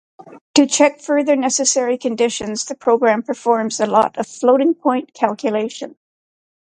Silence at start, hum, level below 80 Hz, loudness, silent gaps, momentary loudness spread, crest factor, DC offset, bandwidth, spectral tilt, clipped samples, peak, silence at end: 0.2 s; none; -64 dBFS; -17 LUFS; 0.41-0.54 s; 7 LU; 18 dB; under 0.1%; 9.6 kHz; -2.5 dB/octave; under 0.1%; 0 dBFS; 0.75 s